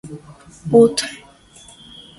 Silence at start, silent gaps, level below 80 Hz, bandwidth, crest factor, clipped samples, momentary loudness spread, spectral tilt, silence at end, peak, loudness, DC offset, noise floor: 0.05 s; none; -56 dBFS; 11.5 kHz; 20 dB; under 0.1%; 26 LU; -5 dB/octave; 1.05 s; 0 dBFS; -16 LUFS; under 0.1%; -46 dBFS